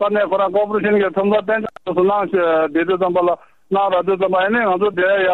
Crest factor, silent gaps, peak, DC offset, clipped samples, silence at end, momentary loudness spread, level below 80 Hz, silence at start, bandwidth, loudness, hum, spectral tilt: 12 dB; none; -4 dBFS; 0.3%; under 0.1%; 0 s; 4 LU; -58 dBFS; 0 s; 4.2 kHz; -17 LUFS; none; -8 dB/octave